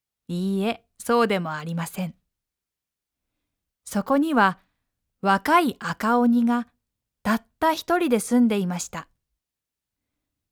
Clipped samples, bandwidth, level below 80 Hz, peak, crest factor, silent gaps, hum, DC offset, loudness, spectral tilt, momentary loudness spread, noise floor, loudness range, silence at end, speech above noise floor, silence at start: under 0.1%; 20 kHz; -62 dBFS; -6 dBFS; 18 dB; none; none; under 0.1%; -23 LUFS; -5.5 dB/octave; 13 LU; -87 dBFS; 6 LU; 1.45 s; 65 dB; 0.3 s